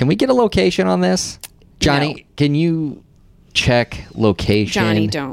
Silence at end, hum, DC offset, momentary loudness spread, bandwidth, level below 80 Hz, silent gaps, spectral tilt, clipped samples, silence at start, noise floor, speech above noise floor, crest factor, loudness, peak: 0 s; none; under 0.1%; 9 LU; 16.5 kHz; -38 dBFS; none; -5.5 dB/octave; under 0.1%; 0 s; -48 dBFS; 32 dB; 14 dB; -17 LUFS; -4 dBFS